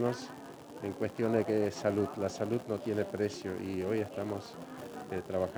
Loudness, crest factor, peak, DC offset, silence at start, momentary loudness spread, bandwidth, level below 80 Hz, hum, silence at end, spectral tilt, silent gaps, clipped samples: -35 LUFS; 18 dB; -16 dBFS; under 0.1%; 0 s; 14 LU; over 20 kHz; -70 dBFS; none; 0 s; -6.5 dB/octave; none; under 0.1%